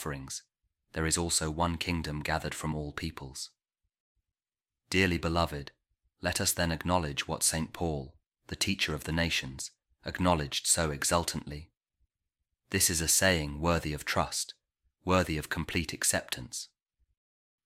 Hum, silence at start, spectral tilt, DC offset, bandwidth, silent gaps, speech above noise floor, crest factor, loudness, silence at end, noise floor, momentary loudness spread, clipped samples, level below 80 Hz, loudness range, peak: none; 0 s; -3 dB/octave; under 0.1%; 16.5 kHz; 4.00-4.15 s; over 59 dB; 22 dB; -30 LUFS; 1 s; under -90 dBFS; 15 LU; under 0.1%; -48 dBFS; 5 LU; -10 dBFS